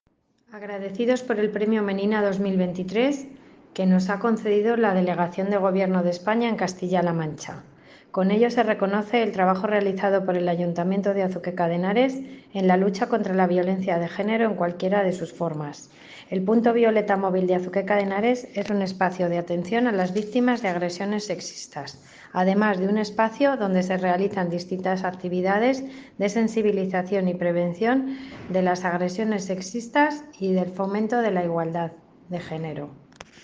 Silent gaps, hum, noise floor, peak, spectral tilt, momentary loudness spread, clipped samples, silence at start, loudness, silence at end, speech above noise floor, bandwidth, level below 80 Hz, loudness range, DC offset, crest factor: none; none; -65 dBFS; -6 dBFS; -6.5 dB/octave; 11 LU; under 0.1%; 0.5 s; -24 LUFS; 0.2 s; 42 dB; 7.8 kHz; -66 dBFS; 2 LU; under 0.1%; 18 dB